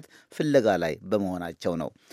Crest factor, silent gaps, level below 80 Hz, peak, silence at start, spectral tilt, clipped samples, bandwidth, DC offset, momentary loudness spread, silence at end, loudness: 20 dB; none; -60 dBFS; -8 dBFS; 0.3 s; -6.5 dB/octave; under 0.1%; 15 kHz; under 0.1%; 10 LU; 0.25 s; -27 LUFS